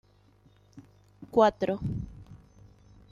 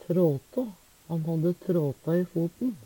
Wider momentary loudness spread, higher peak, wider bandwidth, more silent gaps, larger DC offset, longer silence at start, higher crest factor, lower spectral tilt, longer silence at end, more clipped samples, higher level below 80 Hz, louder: first, 20 LU vs 8 LU; first, -10 dBFS vs -14 dBFS; second, 7.4 kHz vs 17.5 kHz; neither; neither; first, 0.75 s vs 0.1 s; first, 22 dB vs 14 dB; second, -7 dB/octave vs -9.5 dB/octave; first, 0.75 s vs 0 s; neither; first, -52 dBFS vs -66 dBFS; about the same, -27 LUFS vs -29 LUFS